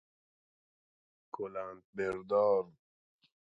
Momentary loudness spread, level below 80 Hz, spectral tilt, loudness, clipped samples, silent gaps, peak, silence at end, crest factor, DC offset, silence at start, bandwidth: 17 LU; -74 dBFS; -7 dB/octave; -34 LUFS; under 0.1%; 1.84-1.93 s; -18 dBFS; 0.8 s; 20 dB; under 0.1%; 1.35 s; 7.6 kHz